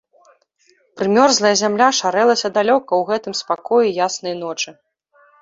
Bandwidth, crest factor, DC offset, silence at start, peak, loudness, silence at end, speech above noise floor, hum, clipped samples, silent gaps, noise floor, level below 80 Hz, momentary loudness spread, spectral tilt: 7.8 kHz; 16 dB; under 0.1%; 0.95 s; -2 dBFS; -17 LUFS; 0.7 s; 42 dB; none; under 0.1%; none; -59 dBFS; -66 dBFS; 11 LU; -2.5 dB/octave